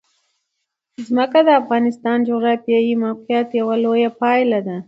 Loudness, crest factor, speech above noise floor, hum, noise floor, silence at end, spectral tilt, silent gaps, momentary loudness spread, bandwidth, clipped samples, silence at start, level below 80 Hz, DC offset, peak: -17 LUFS; 16 dB; 60 dB; none; -76 dBFS; 0.05 s; -7 dB/octave; none; 6 LU; 7.6 kHz; under 0.1%; 1 s; -70 dBFS; under 0.1%; -2 dBFS